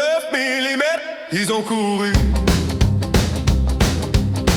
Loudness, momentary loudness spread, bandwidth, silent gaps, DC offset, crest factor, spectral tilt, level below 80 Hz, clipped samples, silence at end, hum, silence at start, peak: -19 LUFS; 3 LU; 20 kHz; none; under 0.1%; 14 dB; -5 dB/octave; -24 dBFS; under 0.1%; 0 s; none; 0 s; -4 dBFS